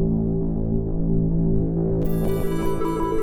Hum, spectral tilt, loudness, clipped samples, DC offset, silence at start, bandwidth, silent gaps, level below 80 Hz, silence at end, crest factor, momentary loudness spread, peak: none; -9 dB/octave; -23 LUFS; under 0.1%; under 0.1%; 0 s; 16.5 kHz; none; -28 dBFS; 0 s; 12 dB; 3 LU; -8 dBFS